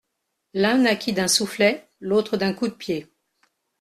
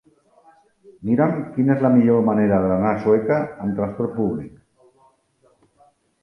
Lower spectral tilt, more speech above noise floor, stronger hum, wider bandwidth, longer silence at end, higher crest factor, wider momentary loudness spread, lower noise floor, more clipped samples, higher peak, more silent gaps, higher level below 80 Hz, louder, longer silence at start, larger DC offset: second, -3.5 dB/octave vs -11 dB/octave; first, 56 dB vs 42 dB; neither; first, 14 kHz vs 5.8 kHz; second, 0.75 s vs 1.75 s; about the same, 18 dB vs 18 dB; about the same, 11 LU vs 9 LU; first, -78 dBFS vs -61 dBFS; neither; about the same, -4 dBFS vs -4 dBFS; neither; second, -62 dBFS vs -52 dBFS; second, -22 LUFS vs -19 LUFS; second, 0.55 s vs 1 s; neither